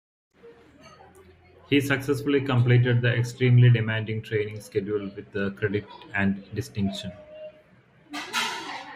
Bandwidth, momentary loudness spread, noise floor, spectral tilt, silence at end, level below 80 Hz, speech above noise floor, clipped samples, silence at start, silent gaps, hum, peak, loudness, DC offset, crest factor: 15 kHz; 16 LU; -57 dBFS; -6.5 dB/octave; 0 s; -60 dBFS; 33 dB; under 0.1%; 0.45 s; none; none; -8 dBFS; -25 LUFS; under 0.1%; 18 dB